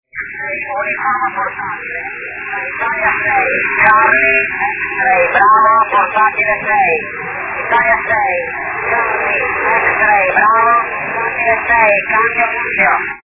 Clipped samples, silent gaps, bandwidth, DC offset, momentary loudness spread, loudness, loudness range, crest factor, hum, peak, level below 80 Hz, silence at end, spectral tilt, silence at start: under 0.1%; none; 4 kHz; under 0.1%; 11 LU; -12 LUFS; 4 LU; 14 dB; none; 0 dBFS; -46 dBFS; 0.05 s; -7.5 dB/octave; 0.15 s